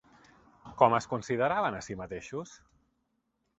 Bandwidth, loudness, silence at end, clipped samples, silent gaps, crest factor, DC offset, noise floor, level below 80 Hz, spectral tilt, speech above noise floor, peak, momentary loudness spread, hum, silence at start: 8.2 kHz; -30 LUFS; 1.05 s; under 0.1%; none; 24 dB; under 0.1%; -78 dBFS; -62 dBFS; -5.5 dB/octave; 49 dB; -8 dBFS; 16 LU; none; 0.65 s